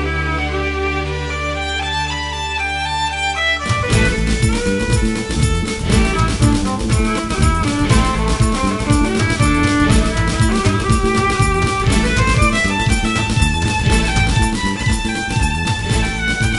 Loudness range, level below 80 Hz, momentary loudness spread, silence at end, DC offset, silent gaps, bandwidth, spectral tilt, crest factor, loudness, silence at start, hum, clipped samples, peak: 3 LU; -22 dBFS; 5 LU; 0 s; under 0.1%; none; 11.5 kHz; -5 dB/octave; 16 dB; -16 LUFS; 0 s; none; under 0.1%; 0 dBFS